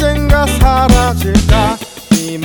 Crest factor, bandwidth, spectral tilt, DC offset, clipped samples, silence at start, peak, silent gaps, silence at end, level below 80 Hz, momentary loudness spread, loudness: 10 dB; over 20 kHz; -5.5 dB/octave; under 0.1%; 0.2%; 0 s; 0 dBFS; none; 0 s; -14 dBFS; 5 LU; -11 LUFS